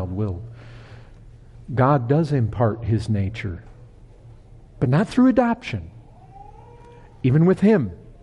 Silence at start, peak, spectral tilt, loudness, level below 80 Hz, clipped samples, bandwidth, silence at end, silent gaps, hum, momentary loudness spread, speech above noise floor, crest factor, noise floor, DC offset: 0 s; -6 dBFS; -9 dB/octave; -21 LUFS; -46 dBFS; under 0.1%; 10.5 kHz; 0.1 s; none; none; 17 LU; 26 dB; 16 dB; -45 dBFS; under 0.1%